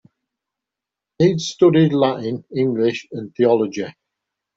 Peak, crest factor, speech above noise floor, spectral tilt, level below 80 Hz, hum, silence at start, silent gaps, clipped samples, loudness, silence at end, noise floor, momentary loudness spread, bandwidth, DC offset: -4 dBFS; 16 dB; 68 dB; -6.5 dB/octave; -60 dBFS; none; 1.2 s; none; under 0.1%; -18 LUFS; 0.65 s; -86 dBFS; 14 LU; 8 kHz; under 0.1%